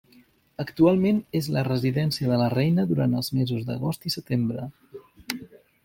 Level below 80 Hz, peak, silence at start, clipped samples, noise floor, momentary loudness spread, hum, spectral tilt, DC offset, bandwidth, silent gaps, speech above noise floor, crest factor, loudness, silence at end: -58 dBFS; -6 dBFS; 0.6 s; under 0.1%; -58 dBFS; 14 LU; none; -7 dB/octave; under 0.1%; 16.5 kHz; none; 34 dB; 18 dB; -25 LUFS; 0.3 s